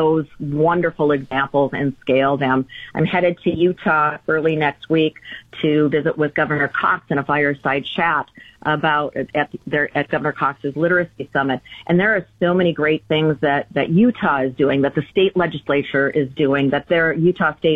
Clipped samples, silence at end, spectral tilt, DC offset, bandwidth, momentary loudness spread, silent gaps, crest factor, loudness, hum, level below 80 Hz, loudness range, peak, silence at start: under 0.1%; 0 s; -8.5 dB/octave; under 0.1%; 5.2 kHz; 6 LU; none; 12 dB; -19 LUFS; none; -52 dBFS; 2 LU; -6 dBFS; 0 s